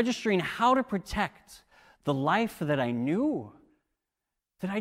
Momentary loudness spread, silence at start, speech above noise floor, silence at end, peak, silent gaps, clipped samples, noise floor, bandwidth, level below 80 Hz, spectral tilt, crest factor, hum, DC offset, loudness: 11 LU; 0 s; 59 dB; 0 s; -12 dBFS; none; under 0.1%; -87 dBFS; 16 kHz; -56 dBFS; -6 dB/octave; 18 dB; none; under 0.1%; -29 LUFS